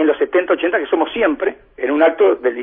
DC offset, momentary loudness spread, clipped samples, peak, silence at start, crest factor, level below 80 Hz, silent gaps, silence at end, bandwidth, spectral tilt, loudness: under 0.1%; 8 LU; under 0.1%; -2 dBFS; 0 s; 14 dB; -54 dBFS; none; 0 s; 3.7 kHz; -7 dB/octave; -16 LUFS